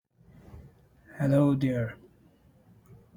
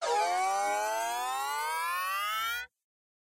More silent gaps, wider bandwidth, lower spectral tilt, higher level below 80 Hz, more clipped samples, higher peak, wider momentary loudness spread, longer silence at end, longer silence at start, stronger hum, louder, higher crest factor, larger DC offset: neither; first, 18 kHz vs 16 kHz; first, -9 dB/octave vs 1 dB/octave; first, -58 dBFS vs -70 dBFS; neither; first, -14 dBFS vs -18 dBFS; first, 27 LU vs 4 LU; first, 1.2 s vs 0.55 s; first, 0.55 s vs 0 s; neither; first, -27 LUFS vs -31 LUFS; about the same, 18 dB vs 14 dB; neither